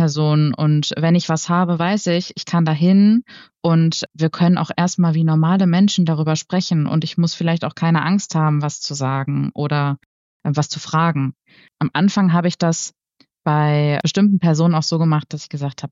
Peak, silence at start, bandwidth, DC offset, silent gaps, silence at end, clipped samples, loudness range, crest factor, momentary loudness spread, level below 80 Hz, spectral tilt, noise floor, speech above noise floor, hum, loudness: -6 dBFS; 0 s; 7.8 kHz; under 0.1%; 10.06-10.40 s; 0.05 s; under 0.1%; 4 LU; 12 dB; 8 LU; -64 dBFS; -6 dB/octave; -59 dBFS; 42 dB; none; -18 LUFS